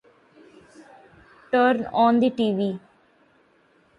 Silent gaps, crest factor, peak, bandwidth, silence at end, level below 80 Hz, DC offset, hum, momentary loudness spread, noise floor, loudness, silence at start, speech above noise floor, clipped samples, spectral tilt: none; 18 dB; -8 dBFS; 5.6 kHz; 1.2 s; -66 dBFS; under 0.1%; none; 9 LU; -61 dBFS; -21 LUFS; 0.8 s; 40 dB; under 0.1%; -7.5 dB/octave